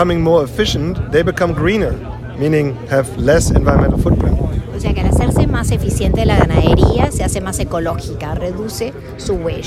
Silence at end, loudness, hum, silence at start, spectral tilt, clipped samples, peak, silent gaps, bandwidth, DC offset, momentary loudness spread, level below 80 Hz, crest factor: 0 s; -15 LUFS; none; 0 s; -6 dB/octave; under 0.1%; 0 dBFS; none; 15 kHz; under 0.1%; 10 LU; -22 dBFS; 14 dB